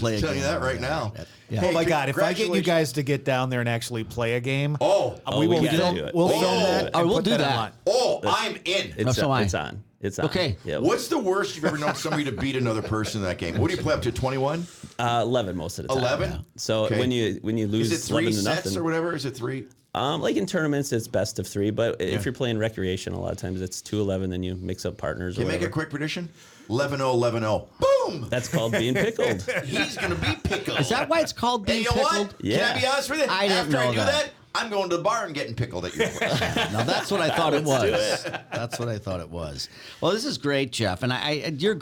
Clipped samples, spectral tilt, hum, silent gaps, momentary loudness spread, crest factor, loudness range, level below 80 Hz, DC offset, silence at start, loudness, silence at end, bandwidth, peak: under 0.1%; -5 dB/octave; none; none; 9 LU; 16 dB; 5 LU; -50 dBFS; under 0.1%; 0 s; -25 LUFS; 0 s; 19.5 kHz; -10 dBFS